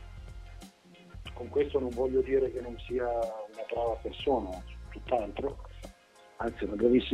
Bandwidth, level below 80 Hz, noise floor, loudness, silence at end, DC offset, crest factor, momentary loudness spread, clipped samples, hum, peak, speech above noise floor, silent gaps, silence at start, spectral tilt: 12 kHz; -48 dBFS; -57 dBFS; -32 LUFS; 0 s; under 0.1%; 22 dB; 20 LU; under 0.1%; none; -12 dBFS; 26 dB; none; 0 s; -7 dB/octave